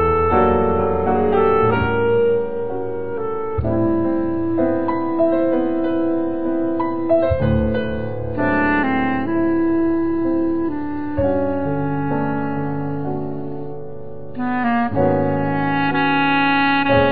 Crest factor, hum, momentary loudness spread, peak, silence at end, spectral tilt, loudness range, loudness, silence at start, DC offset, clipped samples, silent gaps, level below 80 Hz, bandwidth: 14 dB; none; 9 LU; -4 dBFS; 0 s; -10.5 dB/octave; 4 LU; -19 LUFS; 0 s; 3%; under 0.1%; none; -38 dBFS; 4.7 kHz